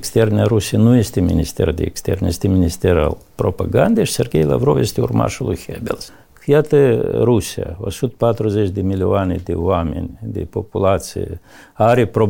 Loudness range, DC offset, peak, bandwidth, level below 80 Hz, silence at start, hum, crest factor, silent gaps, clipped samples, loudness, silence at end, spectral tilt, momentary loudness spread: 3 LU; under 0.1%; -2 dBFS; 17 kHz; -34 dBFS; 0 s; none; 14 dB; none; under 0.1%; -17 LUFS; 0 s; -6.5 dB/octave; 12 LU